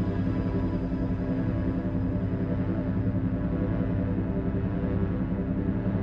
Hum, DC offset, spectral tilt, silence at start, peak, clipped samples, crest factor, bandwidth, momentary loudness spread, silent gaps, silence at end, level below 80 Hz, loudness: none; under 0.1%; -11 dB/octave; 0 s; -14 dBFS; under 0.1%; 14 dB; 5.4 kHz; 1 LU; none; 0 s; -36 dBFS; -29 LUFS